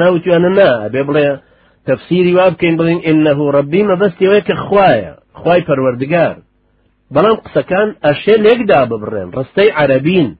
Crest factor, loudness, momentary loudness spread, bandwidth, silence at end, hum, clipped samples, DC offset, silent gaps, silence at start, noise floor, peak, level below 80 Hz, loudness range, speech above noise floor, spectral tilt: 12 dB; -12 LUFS; 8 LU; 5 kHz; 0.05 s; none; under 0.1%; under 0.1%; none; 0 s; -56 dBFS; 0 dBFS; -48 dBFS; 2 LU; 45 dB; -10 dB/octave